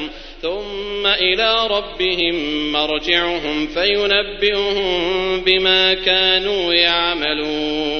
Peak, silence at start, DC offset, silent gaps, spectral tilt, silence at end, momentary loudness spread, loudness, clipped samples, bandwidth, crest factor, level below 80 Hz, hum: 0 dBFS; 0 s; 0.1%; none; -4 dB/octave; 0 s; 8 LU; -16 LUFS; under 0.1%; 6.6 kHz; 18 dB; -38 dBFS; none